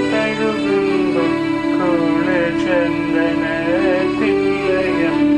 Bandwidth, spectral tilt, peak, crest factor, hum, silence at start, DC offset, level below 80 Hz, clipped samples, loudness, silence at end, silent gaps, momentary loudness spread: 9.6 kHz; -6.5 dB/octave; -4 dBFS; 12 dB; none; 0 s; under 0.1%; -44 dBFS; under 0.1%; -17 LUFS; 0 s; none; 2 LU